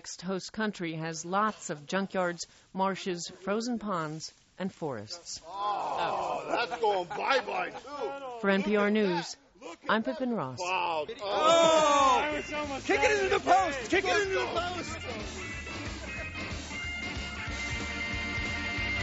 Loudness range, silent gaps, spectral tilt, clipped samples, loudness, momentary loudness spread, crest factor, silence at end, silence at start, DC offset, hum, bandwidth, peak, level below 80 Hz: 9 LU; none; -2.5 dB/octave; under 0.1%; -30 LUFS; 13 LU; 20 dB; 0 s; 0.05 s; under 0.1%; none; 8 kHz; -12 dBFS; -50 dBFS